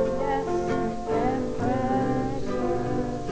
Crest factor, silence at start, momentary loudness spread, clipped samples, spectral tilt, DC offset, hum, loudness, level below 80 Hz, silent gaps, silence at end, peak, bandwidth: 12 dB; 0 s; 4 LU; under 0.1%; -7.5 dB/octave; under 0.1%; none; -27 LUFS; -42 dBFS; none; 0 s; -12 dBFS; 8 kHz